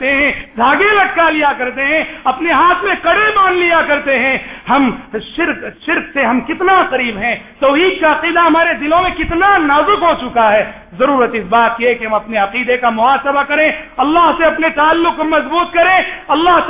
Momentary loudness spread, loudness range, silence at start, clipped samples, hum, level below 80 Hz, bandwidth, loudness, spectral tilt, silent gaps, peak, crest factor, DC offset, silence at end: 6 LU; 3 LU; 0 s; under 0.1%; none; -40 dBFS; 3.9 kHz; -12 LUFS; -7.5 dB/octave; none; 0 dBFS; 12 dB; under 0.1%; 0 s